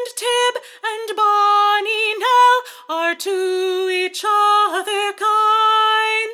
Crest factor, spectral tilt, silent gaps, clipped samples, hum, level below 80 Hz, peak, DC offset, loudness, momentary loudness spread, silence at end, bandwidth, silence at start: 14 dB; 1.5 dB/octave; none; under 0.1%; none; under -90 dBFS; -4 dBFS; under 0.1%; -16 LUFS; 8 LU; 0 s; 17 kHz; 0 s